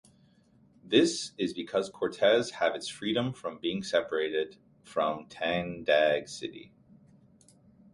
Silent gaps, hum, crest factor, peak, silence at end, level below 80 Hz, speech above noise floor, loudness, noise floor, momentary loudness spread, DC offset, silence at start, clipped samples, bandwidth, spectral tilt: none; none; 22 dB; -10 dBFS; 1.3 s; -66 dBFS; 34 dB; -30 LUFS; -63 dBFS; 10 LU; under 0.1%; 0.85 s; under 0.1%; 11.5 kHz; -4 dB/octave